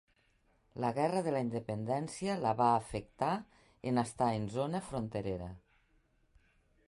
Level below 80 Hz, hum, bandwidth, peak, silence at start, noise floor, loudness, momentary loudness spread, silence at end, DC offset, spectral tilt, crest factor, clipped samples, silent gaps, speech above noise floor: -62 dBFS; none; 11.5 kHz; -16 dBFS; 0.75 s; -72 dBFS; -35 LUFS; 10 LU; 1.3 s; under 0.1%; -6.5 dB/octave; 20 dB; under 0.1%; none; 38 dB